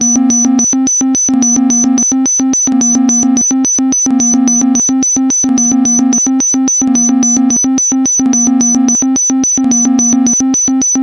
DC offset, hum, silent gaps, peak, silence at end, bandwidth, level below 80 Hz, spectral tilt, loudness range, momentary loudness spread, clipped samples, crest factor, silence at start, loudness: under 0.1%; none; none; 0 dBFS; 0 s; 11 kHz; -50 dBFS; -2.5 dB/octave; 0 LU; 1 LU; under 0.1%; 8 dB; 0 s; -8 LUFS